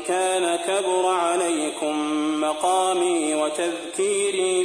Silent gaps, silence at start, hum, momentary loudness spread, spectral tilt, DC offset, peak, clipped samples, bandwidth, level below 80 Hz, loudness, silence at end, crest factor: none; 0 s; none; 4 LU; -2 dB/octave; under 0.1%; -8 dBFS; under 0.1%; 10.5 kHz; -68 dBFS; -22 LUFS; 0 s; 14 dB